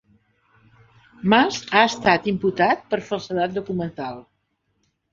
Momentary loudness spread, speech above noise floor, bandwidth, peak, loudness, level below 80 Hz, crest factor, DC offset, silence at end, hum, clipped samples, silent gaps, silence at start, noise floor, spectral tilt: 12 LU; 51 dB; 7.6 kHz; -2 dBFS; -21 LUFS; -58 dBFS; 22 dB; under 0.1%; 0.9 s; none; under 0.1%; none; 1.25 s; -71 dBFS; -5 dB/octave